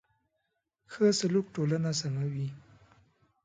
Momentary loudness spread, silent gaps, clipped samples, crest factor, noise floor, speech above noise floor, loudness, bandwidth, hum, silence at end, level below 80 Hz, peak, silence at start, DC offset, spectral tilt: 11 LU; none; under 0.1%; 18 dB; -81 dBFS; 52 dB; -30 LUFS; 9.6 kHz; none; 0.85 s; -70 dBFS; -14 dBFS; 0.9 s; under 0.1%; -5.5 dB/octave